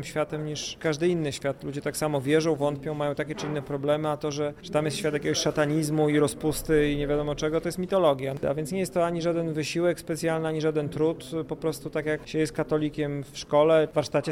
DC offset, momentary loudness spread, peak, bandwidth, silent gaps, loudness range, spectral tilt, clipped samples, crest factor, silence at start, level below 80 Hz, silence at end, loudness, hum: under 0.1%; 8 LU; -10 dBFS; 16 kHz; none; 3 LU; -5.5 dB/octave; under 0.1%; 16 dB; 0 s; -50 dBFS; 0 s; -27 LUFS; none